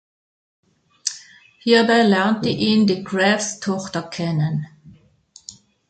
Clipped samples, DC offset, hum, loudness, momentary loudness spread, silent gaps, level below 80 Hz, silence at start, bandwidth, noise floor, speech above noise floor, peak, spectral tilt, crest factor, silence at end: under 0.1%; under 0.1%; none; -19 LUFS; 23 LU; none; -60 dBFS; 1.05 s; 9.2 kHz; -52 dBFS; 33 dB; -2 dBFS; -4.5 dB/octave; 18 dB; 0.4 s